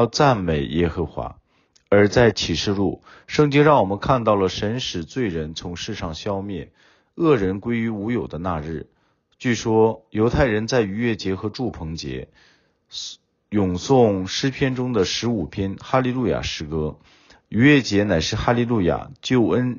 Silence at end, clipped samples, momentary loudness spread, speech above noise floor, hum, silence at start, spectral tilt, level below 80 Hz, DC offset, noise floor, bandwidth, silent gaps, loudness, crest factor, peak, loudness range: 0 s; under 0.1%; 13 LU; 41 dB; none; 0 s; -5 dB/octave; -42 dBFS; under 0.1%; -62 dBFS; 7.4 kHz; none; -21 LUFS; 18 dB; -4 dBFS; 6 LU